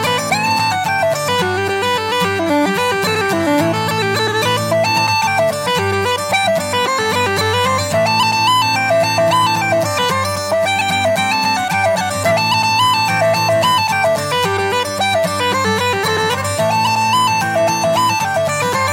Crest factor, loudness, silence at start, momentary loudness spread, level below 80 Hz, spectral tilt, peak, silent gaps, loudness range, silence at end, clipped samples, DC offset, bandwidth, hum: 12 dB; -15 LUFS; 0 s; 3 LU; -56 dBFS; -3.5 dB/octave; -2 dBFS; none; 2 LU; 0 s; under 0.1%; under 0.1%; 17 kHz; none